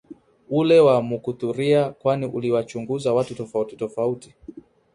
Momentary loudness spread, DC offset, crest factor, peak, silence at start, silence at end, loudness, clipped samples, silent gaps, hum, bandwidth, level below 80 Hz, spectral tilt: 13 LU; under 0.1%; 16 dB; -6 dBFS; 0.1 s; 0.35 s; -22 LUFS; under 0.1%; none; none; 11 kHz; -62 dBFS; -7 dB/octave